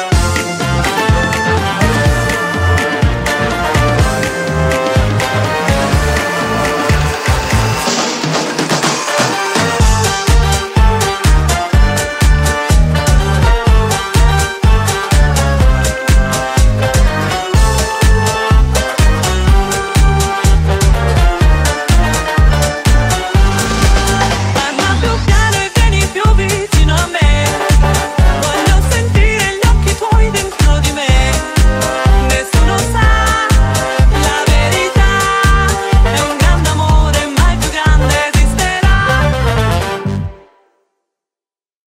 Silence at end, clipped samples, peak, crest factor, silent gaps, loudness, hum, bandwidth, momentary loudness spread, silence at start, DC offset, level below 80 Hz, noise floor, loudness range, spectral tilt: 1.55 s; under 0.1%; 0 dBFS; 10 dB; none; -12 LUFS; none; 16 kHz; 3 LU; 0 s; under 0.1%; -14 dBFS; under -90 dBFS; 2 LU; -4.5 dB/octave